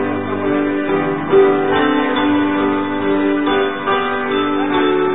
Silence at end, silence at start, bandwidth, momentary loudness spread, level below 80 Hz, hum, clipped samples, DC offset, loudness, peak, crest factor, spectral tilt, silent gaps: 0 s; 0 s; 4 kHz; 5 LU; -48 dBFS; none; under 0.1%; 1%; -16 LUFS; 0 dBFS; 14 dB; -11 dB/octave; none